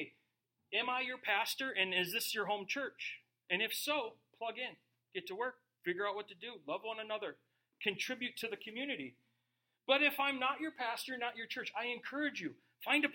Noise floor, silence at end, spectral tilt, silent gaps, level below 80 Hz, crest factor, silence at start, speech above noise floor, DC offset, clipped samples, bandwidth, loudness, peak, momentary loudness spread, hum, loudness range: -85 dBFS; 0 s; -2.5 dB/octave; none; under -90 dBFS; 24 dB; 0 s; 46 dB; under 0.1%; under 0.1%; 16.5 kHz; -38 LUFS; -16 dBFS; 12 LU; none; 6 LU